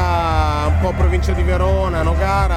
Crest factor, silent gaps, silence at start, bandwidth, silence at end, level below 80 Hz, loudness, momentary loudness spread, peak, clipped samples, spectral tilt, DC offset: 10 dB; none; 0 s; 10 kHz; 0 s; -18 dBFS; -17 LUFS; 1 LU; -4 dBFS; under 0.1%; -7 dB/octave; under 0.1%